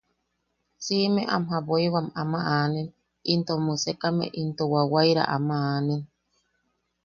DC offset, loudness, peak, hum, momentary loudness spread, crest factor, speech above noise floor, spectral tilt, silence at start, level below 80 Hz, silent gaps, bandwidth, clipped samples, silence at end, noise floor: under 0.1%; -25 LUFS; -6 dBFS; none; 8 LU; 22 dB; 51 dB; -5.5 dB/octave; 0.8 s; -64 dBFS; none; 7.2 kHz; under 0.1%; 1 s; -76 dBFS